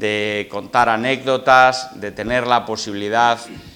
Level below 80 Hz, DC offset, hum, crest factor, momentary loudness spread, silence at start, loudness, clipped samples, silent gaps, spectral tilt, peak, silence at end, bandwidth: -50 dBFS; under 0.1%; none; 18 dB; 13 LU; 0 s; -17 LUFS; under 0.1%; none; -4 dB/octave; 0 dBFS; 0.05 s; 18.5 kHz